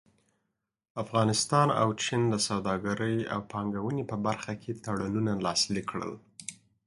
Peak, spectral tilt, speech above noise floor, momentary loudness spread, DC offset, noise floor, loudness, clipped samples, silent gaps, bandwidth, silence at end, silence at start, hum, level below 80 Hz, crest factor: -10 dBFS; -4.5 dB/octave; 53 dB; 14 LU; under 0.1%; -83 dBFS; -29 LUFS; under 0.1%; none; 11.5 kHz; 0.3 s; 0.95 s; none; -60 dBFS; 22 dB